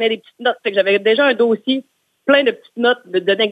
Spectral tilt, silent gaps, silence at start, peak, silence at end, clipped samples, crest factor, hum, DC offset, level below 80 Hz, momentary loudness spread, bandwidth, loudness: -5.5 dB/octave; none; 0 s; 0 dBFS; 0 s; under 0.1%; 16 dB; none; under 0.1%; -70 dBFS; 7 LU; 8.8 kHz; -16 LUFS